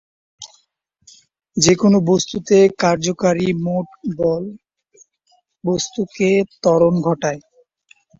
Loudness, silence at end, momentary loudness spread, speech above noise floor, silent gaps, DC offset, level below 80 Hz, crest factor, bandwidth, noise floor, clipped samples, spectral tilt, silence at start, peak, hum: -17 LUFS; 0.8 s; 16 LU; 48 dB; none; under 0.1%; -54 dBFS; 18 dB; 8 kHz; -65 dBFS; under 0.1%; -5 dB/octave; 0.4 s; -2 dBFS; none